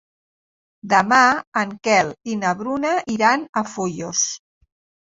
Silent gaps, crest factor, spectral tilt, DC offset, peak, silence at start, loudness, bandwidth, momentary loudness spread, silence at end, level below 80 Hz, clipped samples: 1.47-1.52 s, 3.49-3.53 s; 18 dB; -3 dB/octave; under 0.1%; -2 dBFS; 0.85 s; -19 LUFS; 8 kHz; 10 LU; 0.65 s; -62 dBFS; under 0.1%